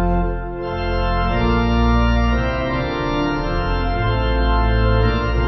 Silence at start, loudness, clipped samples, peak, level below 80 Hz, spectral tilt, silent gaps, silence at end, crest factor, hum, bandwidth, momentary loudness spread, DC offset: 0 s; -19 LUFS; under 0.1%; -4 dBFS; -20 dBFS; -8 dB/octave; none; 0 s; 12 dB; none; 6 kHz; 5 LU; under 0.1%